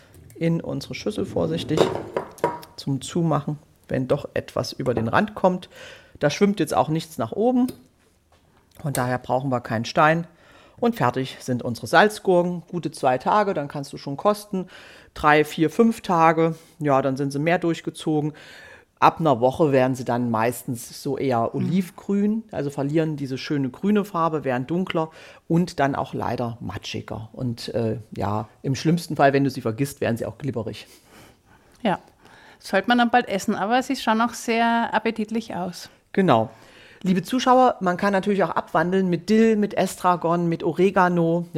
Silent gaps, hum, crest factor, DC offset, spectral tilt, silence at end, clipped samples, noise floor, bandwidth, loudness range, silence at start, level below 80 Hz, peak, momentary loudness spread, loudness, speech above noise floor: none; none; 22 dB; under 0.1%; -6 dB/octave; 0 s; under 0.1%; -59 dBFS; 16 kHz; 5 LU; 0.35 s; -56 dBFS; -2 dBFS; 12 LU; -23 LUFS; 37 dB